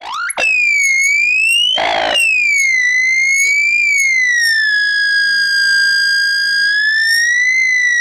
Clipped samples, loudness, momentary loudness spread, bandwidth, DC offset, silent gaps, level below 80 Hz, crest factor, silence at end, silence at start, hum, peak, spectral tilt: under 0.1%; -10 LUFS; 2 LU; 16 kHz; under 0.1%; none; -52 dBFS; 10 dB; 0 s; 0 s; none; -4 dBFS; 2.5 dB/octave